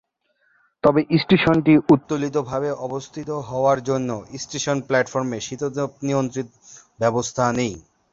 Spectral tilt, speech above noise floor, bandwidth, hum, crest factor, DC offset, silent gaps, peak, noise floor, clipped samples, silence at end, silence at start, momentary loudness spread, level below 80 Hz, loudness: -5.5 dB/octave; 45 dB; 7.8 kHz; none; 18 dB; under 0.1%; none; -4 dBFS; -66 dBFS; under 0.1%; 0.3 s; 0.85 s; 13 LU; -54 dBFS; -21 LUFS